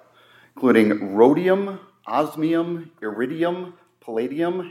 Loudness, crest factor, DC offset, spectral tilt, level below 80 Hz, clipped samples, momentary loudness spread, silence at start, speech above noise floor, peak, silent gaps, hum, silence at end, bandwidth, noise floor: -21 LUFS; 20 dB; under 0.1%; -7.5 dB/octave; -78 dBFS; under 0.1%; 14 LU; 0.55 s; 33 dB; -2 dBFS; none; none; 0 s; 15.5 kHz; -54 dBFS